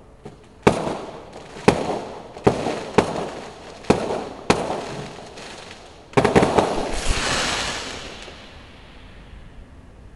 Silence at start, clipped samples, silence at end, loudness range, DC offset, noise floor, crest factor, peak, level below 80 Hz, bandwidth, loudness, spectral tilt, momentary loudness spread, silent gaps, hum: 0 s; under 0.1%; 0.05 s; 4 LU; 0.1%; -44 dBFS; 24 dB; 0 dBFS; -38 dBFS; 12 kHz; -22 LUFS; -4.5 dB/octave; 24 LU; none; none